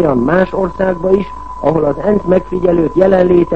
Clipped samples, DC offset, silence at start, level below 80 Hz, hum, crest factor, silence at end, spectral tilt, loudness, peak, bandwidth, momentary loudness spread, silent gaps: under 0.1%; 2%; 0 s; -34 dBFS; none; 12 dB; 0 s; -9.5 dB/octave; -13 LUFS; 0 dBFS; 7.8 kHz; 6 LU; none